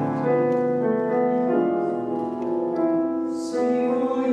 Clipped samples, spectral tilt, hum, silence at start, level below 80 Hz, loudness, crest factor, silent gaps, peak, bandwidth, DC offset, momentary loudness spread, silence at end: under 0.1%; -8 dB/octave; none; 0 s; -70 dBFS; -23 LUFS; 12 dB; none; -10 dBFS; 10 kHz; under 0.1%; 5 LU; 0 s